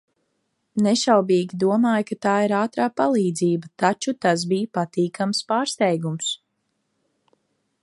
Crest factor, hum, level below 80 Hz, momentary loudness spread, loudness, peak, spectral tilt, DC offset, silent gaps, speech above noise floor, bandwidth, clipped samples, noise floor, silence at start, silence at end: 20 dB; none; -70 dBFS; 6 LU; -22 LUFS; -2 dBFS; -5 dB/octave; under 0.1%; none; 53 dB; 11.5 kHz; under 0.1%; -73 dBFS; 0.75 s; 1.45 s